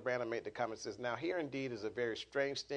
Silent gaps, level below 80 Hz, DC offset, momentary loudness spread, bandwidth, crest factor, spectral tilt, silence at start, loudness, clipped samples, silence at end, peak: none; -74 dBFS; under 0.1%; 4 LU; 10 kHz; 18 dB; -4.5 dB/octave; 0 s; -40 LUFS; under 0.1%; 0 s; -22 dBFS